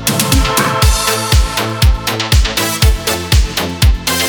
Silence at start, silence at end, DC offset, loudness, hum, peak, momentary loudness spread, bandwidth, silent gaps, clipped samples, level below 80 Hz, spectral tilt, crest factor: 0 s; 0 s; under 0.1%; -13 LUFS; none; 0 dBFS; 3 LU; over 20 kHz; none; under 0.1%; -16 dBFS; -3.5 dB/octave; 12 dB